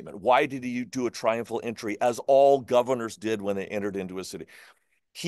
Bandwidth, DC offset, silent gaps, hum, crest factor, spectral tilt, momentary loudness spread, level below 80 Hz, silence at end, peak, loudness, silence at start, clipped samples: 12.5 kHz; under 0.1%; none; none; 18 dB; -5 dB/octave; 16 LU; -70 dBFS; 0 s; -8 dBFS; -26 LUFS; 0 s; under 0.1%